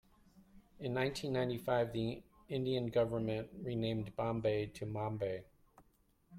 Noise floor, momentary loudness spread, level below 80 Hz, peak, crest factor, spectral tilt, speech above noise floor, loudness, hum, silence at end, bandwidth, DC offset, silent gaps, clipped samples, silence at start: -72 dBFS; 7 LU; -64 dBFS; -22 dBFS; 18 dB; -7 dB/octave; 35 dB; -38 LUFS; none; 0 s; 16 kHz; under 0.1%; none; under 0.1%; 0.35 s